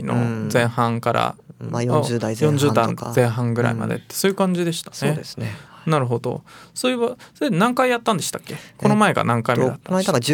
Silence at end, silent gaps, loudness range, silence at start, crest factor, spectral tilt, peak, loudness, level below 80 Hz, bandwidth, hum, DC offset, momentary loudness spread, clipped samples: 0 s; none; 3 LU; 0 s; 18 dB; -5.5 dB/octave; -2 dBFS; -21 LUFS; -60 dBFS; 18 kHz; none; under 0.1%; 11 LU; under 0.1%